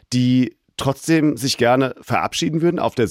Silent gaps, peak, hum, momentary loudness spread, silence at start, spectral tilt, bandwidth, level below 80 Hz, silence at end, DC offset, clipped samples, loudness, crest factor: none; -4 dBFS; none; 7 LU; 0.1 s; -5.5 dB/octave; 16 kHz; -54 dBFS; 0 s; under 0.1%; under 0.1%; -19 LUFS; 14 dB